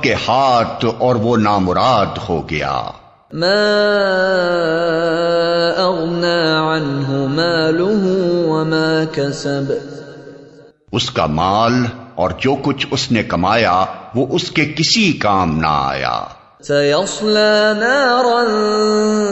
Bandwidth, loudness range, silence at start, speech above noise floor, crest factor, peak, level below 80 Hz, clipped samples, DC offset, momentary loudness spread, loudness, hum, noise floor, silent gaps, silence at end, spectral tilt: 8.4 kHz; 4 LU; 0 s; 28 dB; 14 dB; 0 dBFS; -44 dBFS; under 0.1%; under 0.1%; 8 LU; -15 LUFS; none; -43 dBFS; none; 0 s; -5 dB/octave